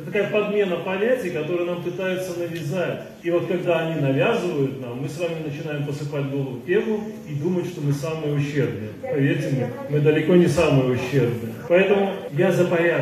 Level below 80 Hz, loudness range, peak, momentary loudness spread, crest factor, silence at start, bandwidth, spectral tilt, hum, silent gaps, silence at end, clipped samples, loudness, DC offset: -56 dBFS; 6 LU; -4 dBFS; 10 LU; 16 dB; 0 s; 14 kHz; -7 dB/octave; none; none; 0 s; under 0.1%; -23 LUFS; under 0.1%